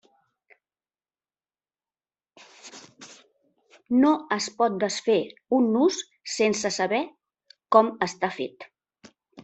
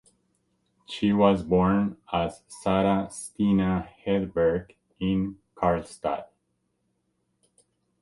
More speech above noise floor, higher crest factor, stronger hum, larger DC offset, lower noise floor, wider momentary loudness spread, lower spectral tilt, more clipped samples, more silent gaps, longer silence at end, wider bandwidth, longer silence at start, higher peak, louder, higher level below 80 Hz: first, over 67 dB vs 50 dB; about the same, 24 dB vs 22 dB; neither; neither; first, under -90 dBFS vs -75 dBFS; first, 23 LU vs 11 LU; second, -4 dB/octave vs -7 dB/octave; neither; neither; second, 0.05 s vs 1.75 s; second, 8.4 kHz vs 11.5 kHz; first, 2.65 s vs 0.9 s; about the same, -4 dBFS vs -6 dBFS; about the same, -24 LUFS vs -26 LUFS; second, -72 dBFS vs -50 dBFS